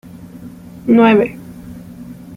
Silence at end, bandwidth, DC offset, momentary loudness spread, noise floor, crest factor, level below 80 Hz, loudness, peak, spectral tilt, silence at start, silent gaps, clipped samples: 0 s; 11.5 kHz; under 0.1%; 25 LU; -34 dBFS; 14 dB; -50 dBFS; -13 LUFS; -2 dBFS; -7.5 dB/octave; 0.35 s; none; under 0.1%